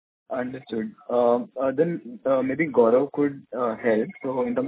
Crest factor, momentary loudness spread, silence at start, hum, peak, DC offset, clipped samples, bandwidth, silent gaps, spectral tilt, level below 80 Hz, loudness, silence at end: 18 dB; 11 LU; 0.3 s; none; -6 dBFS; under 0.1%; under 0.1%; 4 kHz; none; -11 dB/octave; -66 dBFS; -24 LUFS; 0 s